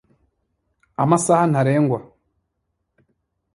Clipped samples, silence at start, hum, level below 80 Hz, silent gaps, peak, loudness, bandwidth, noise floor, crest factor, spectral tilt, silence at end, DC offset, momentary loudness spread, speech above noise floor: under 0.1%; 1 s; none; -60 dBFS; none; -2 dBFS; -18 LUFS; 11.5 kHz; -75 dBFS; 20 dB; -6.5 dB/octave; 1.5 s; under 0.1%; 11 LU; 58 dB